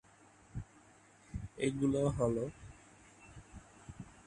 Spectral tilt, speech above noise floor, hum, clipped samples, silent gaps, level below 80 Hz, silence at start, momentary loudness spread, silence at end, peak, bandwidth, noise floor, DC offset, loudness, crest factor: -7 dB/octave; 29 dB; none; under 0.1%; none; -56 dBFS; 0.55 s; 24 LU; 0.15 s; -20 dBFS; 11 kHz; -63 dBFS; under 0.1%; -37 LUFS; 20 dB